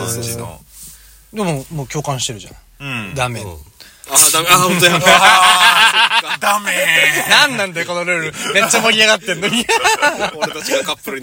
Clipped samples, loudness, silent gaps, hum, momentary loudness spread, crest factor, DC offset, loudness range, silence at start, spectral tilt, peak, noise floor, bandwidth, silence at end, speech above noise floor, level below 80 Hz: 0.2%; -12 LUFS; none; none; 16 LU; 14 dB; under 0.1%; 14 LU; 0 s; -1.5 dB/octave; 0 dBFS; -40 dBFS; over 20 kHz; 0 s; 26 dB; -48 dBFS